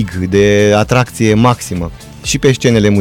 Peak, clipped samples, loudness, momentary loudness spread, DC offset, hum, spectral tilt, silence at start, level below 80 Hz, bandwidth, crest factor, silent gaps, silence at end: 0 dBFS; under 0.1%; -11 LUFS; 12 LU; under 0.1%; none; -5.5 dB/octave; 0 s; -34 dBFS; 17 kHz; 12 dB; none; 0 s